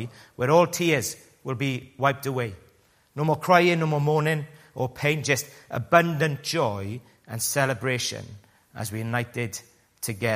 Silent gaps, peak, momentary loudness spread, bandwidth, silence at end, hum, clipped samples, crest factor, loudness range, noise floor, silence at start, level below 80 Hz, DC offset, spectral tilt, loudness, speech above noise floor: none; -2 dBFS; 16 LU; 15.5 kHz; 0 s; none; under 0.1%; 24 dB; 5 LU; -61 dBFS; 0 s; -62 dBFS; under 0.1%; -4.5 dB/octave; -25 LUFS; 36 dB